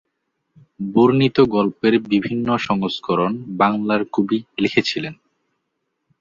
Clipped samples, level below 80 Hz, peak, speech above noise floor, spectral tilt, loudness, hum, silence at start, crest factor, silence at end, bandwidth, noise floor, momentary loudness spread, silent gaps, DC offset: under 0.1%; -56 dBFS; -2 dBFS; 56 dB; -7 dB/octave; -19 LUFS; none; 0.8 s; 18 dB; 1.05 s; 7.6 kHz; -75 dBFS; 7 LU; none; under 0.1%